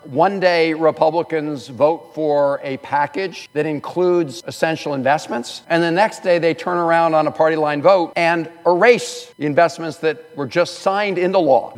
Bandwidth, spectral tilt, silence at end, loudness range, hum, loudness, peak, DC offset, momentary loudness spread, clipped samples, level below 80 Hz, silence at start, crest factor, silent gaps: 13 kHz; -5.5 dB/octave; 0 s; 4 LU; none; -18 LUFS; 0 dBFS; under 0.1%; 8 LU; under 0.1%; -72 dBFS; 0.05 s; 18 dB; none